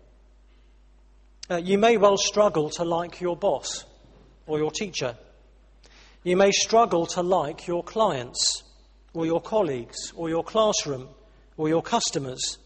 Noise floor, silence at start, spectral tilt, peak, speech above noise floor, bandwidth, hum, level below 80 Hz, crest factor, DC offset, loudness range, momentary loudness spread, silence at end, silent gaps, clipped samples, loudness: -55 dBFS; 1.5 s; -3.5 dB/octave; -6 dBFS; 31 dB; 8.8 kHz; none; -54 dBFS; 20 dB; under 0.1%; 5 LU; 13 LU; 0.1 s; none; under 0.1%; -24 LUFS